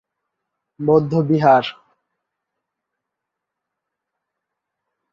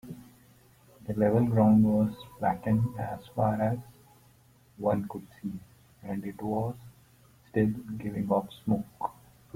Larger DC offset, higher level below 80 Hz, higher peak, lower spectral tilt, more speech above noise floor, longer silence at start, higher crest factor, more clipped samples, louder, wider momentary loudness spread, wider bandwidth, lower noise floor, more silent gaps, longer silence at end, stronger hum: neither; about the same, -62 dBFS vs -58 dBFS; first, -2 dBFS vs -12 dBFS; about the same, -8.5 dB/octave vs -9 dB/octave; first, 66 dB vs 32 dB; first, 0.8 s vs 0.05 s; about the same, 20 dB vs 18 dB; neither; first, -16 LUFS vs -29 LUFS; second, 11 LU vs 17 LU; second, 7 kHz vs 16 kHz; first, -82 dBFS vs -60 dBFS; neither; first, 3.4 s vs 0.45 s; neither